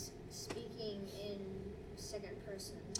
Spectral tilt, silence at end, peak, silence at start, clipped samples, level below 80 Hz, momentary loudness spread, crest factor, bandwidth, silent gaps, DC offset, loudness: -4 dB/octave; 0 s; -24 dBFS; 0 s; under 0.1%; -60 dBFS; 4 LU; 22 dB; 17 kHz; none; under 0.1%; -47 LUFS